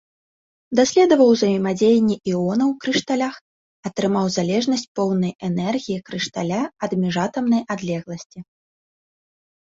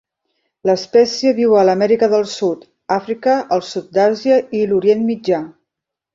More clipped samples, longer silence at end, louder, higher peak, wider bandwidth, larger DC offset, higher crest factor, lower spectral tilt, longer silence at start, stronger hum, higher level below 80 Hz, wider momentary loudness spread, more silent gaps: neither; first, 1.2 s vs 0.65 s; second, -20 LUFS vs -16 LUFS; about the same, -2 dBFS vs -2 dBFS; about the same, 7.8 kHz vs 7.8 kHz; neither; about the same, 18 dB vs 14 dB; about the same, -5.5 dB/octave vs -5.5 dB/octave; about the same, 0.7 s vs 0.65 s; neither; about the same, -60 dBFS vs -60 dBFS; first, 12 LU vs 8 LU; first, 3.41-3.83 s, 4.88-4.95 s, 5.35-5.39 s, 8.26-8.30 s vs none